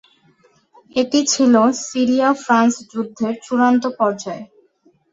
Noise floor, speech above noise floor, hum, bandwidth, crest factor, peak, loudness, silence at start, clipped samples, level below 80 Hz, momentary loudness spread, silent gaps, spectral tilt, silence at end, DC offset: -57 dBFS; 41 dB; none; 7.8 kHz; 16 dB; -2 dBFS; -17 LUFS; 0.95 s; under 0.1%; -64 dBFS; 12 LU; none; -3.5 dB/octave; 0.65 s; under 0.1%